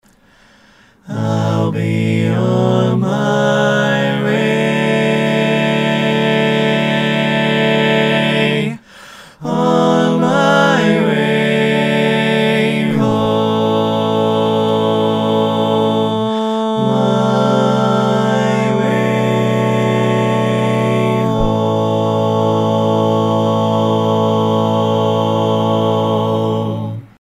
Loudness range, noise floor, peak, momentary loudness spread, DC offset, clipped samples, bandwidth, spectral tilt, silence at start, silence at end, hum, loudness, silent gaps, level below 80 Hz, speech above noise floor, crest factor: 2 LU; -49 dBFS; 0 dBFS; 3 LU; under 0.1%; under 0.1%; 14.5 kHz; -6.5 dB/octave; 1.05 s; 0.15 s; none; -14 LUFS; none; -42 dBFS; 35 dB; 14 dB